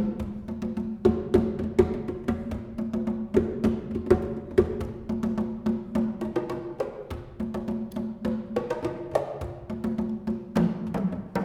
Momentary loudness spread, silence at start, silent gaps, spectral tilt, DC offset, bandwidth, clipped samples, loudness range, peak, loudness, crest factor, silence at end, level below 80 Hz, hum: 9 LU; 0 s; none; -8.5 dB/octave; under 0.1%; 12.5 kHz; under 0.1%; 5 LU; -6 dBFS; -29 LUFS; 22 dB; 0 s; -44 dBFS; none